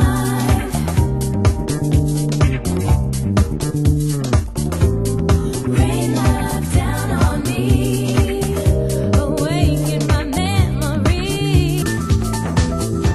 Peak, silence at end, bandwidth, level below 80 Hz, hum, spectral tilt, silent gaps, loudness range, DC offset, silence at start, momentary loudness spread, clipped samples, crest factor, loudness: -2 dBFS; 0 s; 13 kHz; -24 dBFS; none; -6 dB/octave; none; 1 LU; under 0.1%; 0 s; 2 LU; under 0.1%; 16 dB; -18 LUFS